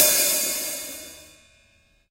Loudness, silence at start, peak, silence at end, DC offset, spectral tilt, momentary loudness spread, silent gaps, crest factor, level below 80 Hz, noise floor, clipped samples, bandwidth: -21 LUFS; 0 s; -2 dBFS; 0.85 s; under 0.1%; 1 dB/octave; 20 LU; none; 24 dB; -60 dBFS; -61 dBFS; under 0.1%; 16 kHz